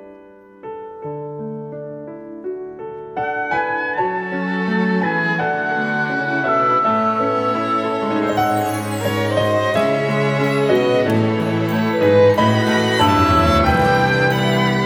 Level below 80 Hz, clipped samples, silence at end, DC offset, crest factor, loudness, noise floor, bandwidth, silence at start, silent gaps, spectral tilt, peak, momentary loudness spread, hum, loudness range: -40 dBFS; under 0.1%; 0 s; under 0.1%; 16 dB; -17 LUFS; -43 dBFS; 19.5 kHz; 0 s; none; -6 dB/octave; -2 dBFS; 16 LU; none; 9 LU